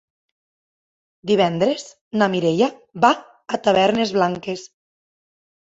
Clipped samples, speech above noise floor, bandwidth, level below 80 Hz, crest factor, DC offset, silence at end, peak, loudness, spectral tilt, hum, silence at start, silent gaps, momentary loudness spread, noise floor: under 0.1%; over 71 dB; 8 kHz; -62 dBFS; 20 dB; under 0.1%; 1.1 s; -2 dBFS; -20 LUFS; -5.5 dB/octave; none; 1.25 s; 2.01-2.11 s; 12 LU; under -90 dBFS